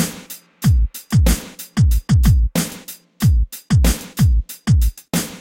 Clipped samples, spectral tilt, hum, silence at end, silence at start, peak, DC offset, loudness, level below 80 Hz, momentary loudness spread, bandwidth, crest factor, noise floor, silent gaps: under 0.1%; -5.5 dB/octave; none; 0 s; 0 s; -4 dBFS; under 0.1%; -18 LUFS; -20 dBFS; 10 LU; 17 kHz; 14 dB; -37 dBFS; none